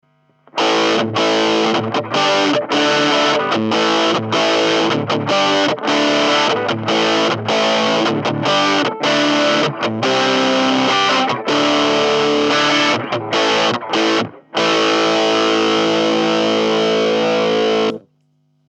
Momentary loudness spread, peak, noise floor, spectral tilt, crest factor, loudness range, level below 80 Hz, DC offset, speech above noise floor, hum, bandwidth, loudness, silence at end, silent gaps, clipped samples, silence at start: 4 LU; -4 dBFS; -61 dBFS; -3.5 dB/octave; 12 dB; 1 LU; -72 dBFS; under 0.1%; 45 dB; none; 9.8 kHz; -15 LUFS; 0.7 s; none; under 0.1%; 0.55 s